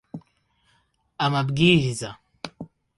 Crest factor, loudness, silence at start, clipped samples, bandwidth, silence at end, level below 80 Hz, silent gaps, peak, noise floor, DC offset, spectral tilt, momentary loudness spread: 22 dB; -21 LUFS; 0.15 s; under 0.1%; 11.5 kHz; 0.35 s; -54 dBFS; none; -4 dBFS; -66 dBFS; under 0.1%; -5.5 dB/octave; 24 LU